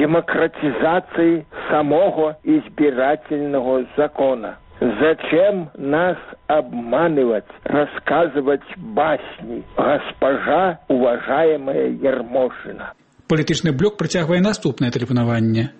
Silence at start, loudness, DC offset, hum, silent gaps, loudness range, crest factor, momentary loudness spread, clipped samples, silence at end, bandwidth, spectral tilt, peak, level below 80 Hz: 0 s; -19 LUFS; under 0.1%; none; none; 2 LU; 12 dB; 7 LU; under 0.1%; 0.1 s; 8.4 kHz; -6.5 dB/octave; -6 dBFS; -50 dBFS